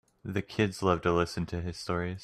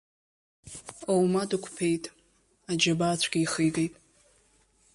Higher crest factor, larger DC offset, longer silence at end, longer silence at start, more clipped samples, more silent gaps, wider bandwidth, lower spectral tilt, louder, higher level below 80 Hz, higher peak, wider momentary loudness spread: about the same, 20 dB vs 20 dB; neither; second, 0 s vs 1.05 s; second, 0.25 s vs 0.65 s; neither; neither; first, 13.5 kHz vs 11.5 kHz; first, -6 dB/octave vs -4.5 dB/octave; second, -31 LUFS vs -27 LUFS; first, -54 dBFS vs -64 dBFS; about the same, -10 dBFS vs -10 dBFS; second, 9 LU vs 18 LU